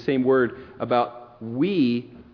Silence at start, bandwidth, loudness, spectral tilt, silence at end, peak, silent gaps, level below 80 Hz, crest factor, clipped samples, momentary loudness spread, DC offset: 0 s; 5.4 kHz; -23 LUFS; -9 dB/octave; 0.1 s; -8 dBFS; none; -60 dBFS; 16 dB; under 0.1%; 13 LU; under 0.1%